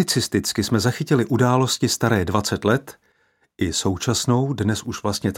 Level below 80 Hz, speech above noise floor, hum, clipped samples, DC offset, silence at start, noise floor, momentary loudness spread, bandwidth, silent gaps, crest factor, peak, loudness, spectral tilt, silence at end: -48 dBFS; 43 dB; none; under 0.1%; under 0.1%; 0 s; -64 dBFS; 6 LU; 17 kHz; none; 18 dB; -2 dBFS; -21 LUFS; -4.5 dB/octave; 0 s